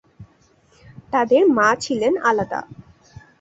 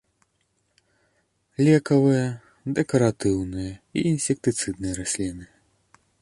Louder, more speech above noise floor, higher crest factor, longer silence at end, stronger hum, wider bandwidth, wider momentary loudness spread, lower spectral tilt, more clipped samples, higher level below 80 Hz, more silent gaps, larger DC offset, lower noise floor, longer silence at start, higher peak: first, -18 LUFS vs -23 LUFS; second, 39 dB vs 48 dB; about the same, 18 dB vs 20 dB; second, 0.6 s vs 0.75 s; neither; second, 8.2 kHz vs 11.5 kHz; second, 10 LU vs 13 LU; second, -4.5 dB/octave vs -6 dB/octave; neither; second, -56 dBFS vs -50 dBFS; neither; neither; second, -57 dBFS vs -71 dBFS; second, 0.2 s vs 1.6 s; first, -2 dBFS vs -6 dBFS